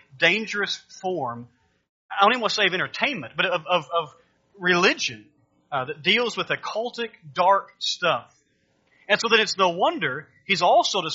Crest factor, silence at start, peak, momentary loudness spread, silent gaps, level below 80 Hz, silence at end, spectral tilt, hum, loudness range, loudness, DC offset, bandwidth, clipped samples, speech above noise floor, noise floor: 22 dB; 0.15 s; -2 dBFS; 12 LU; 1.89-2.09 s; -72 dBFS; 0 s; -1 dB/octave; none; 2 LU; -22 LUFS; under 0.1%; 7.6 kHz; under 0.1%; 43 dB; -67 dBFS